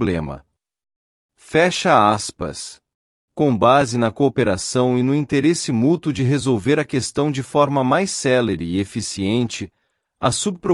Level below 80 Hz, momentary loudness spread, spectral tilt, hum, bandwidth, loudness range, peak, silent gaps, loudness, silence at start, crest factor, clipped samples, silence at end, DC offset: -50 dBFS; 12 LU; -5 dB/octave; none; 12 kHz; 3 LU; -2 dBFS; 0.96-1.29 s, 2.95-3.28 s; -19 LUFS; 0 s; 16 dB; under 0.1%; 0 s; under 0.1%